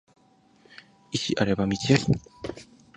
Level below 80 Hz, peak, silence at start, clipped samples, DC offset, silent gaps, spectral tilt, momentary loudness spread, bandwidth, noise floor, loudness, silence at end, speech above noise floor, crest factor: -52 dBFS; -4 dBFS; 1.1 s; under 0.1%; under 0.1%; none; -5.5 dB/octave; 17 LU; 10 kHz; -59 dBFS; -25 LUFS; 0.35 s; 34 dB; 24 dB